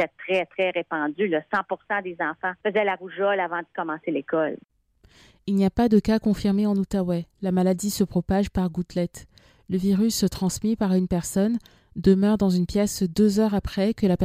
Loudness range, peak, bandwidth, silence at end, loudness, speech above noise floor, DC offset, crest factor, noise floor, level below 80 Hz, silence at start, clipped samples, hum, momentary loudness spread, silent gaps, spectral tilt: 4 LU; -6 dBFS; 16 kHz; 0 s; -24 LUFS; 34 dB; under 0.1%; 18 dB; -57 dBFS; -46 dBFS; 0 s; under 0.1%; none; 8 LU; none; -6 dB/octave